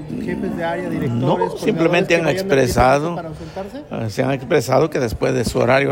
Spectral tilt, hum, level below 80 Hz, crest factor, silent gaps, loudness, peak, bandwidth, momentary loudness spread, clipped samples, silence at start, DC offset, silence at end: -6 dB/octave; none; -40 dBFS; 14 dB; none; -18 LUFS; -4 dBFS; 16.5 kHz; 13 LU; under 0.1%; 0 s; under 0.1%; 0 s